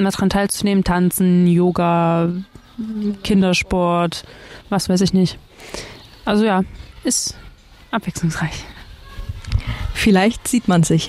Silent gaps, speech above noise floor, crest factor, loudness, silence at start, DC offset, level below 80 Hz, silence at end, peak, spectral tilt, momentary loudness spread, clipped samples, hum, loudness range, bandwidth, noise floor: none; 25 dB; 14 dB; -18 LUFS; 0 s; under 0.1%; -34 dBFS; 0 s; -4 dBFS; -5.5 dB/octave; 17 LU; under 0.1%; none; 5 LU; 15 kHz; -42 dBFS